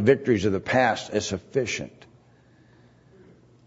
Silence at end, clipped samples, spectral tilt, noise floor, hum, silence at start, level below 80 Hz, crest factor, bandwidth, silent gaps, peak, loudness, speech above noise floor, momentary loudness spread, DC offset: 1.8 s; under 0.1%; -5 dB/octave; -57 dBFS; none; 0 s; -58 dBFS; 22 dB; 8 kHz; none; -6 dBFS; -24 LUFS; 33 dB; 9 LU; under 0.1%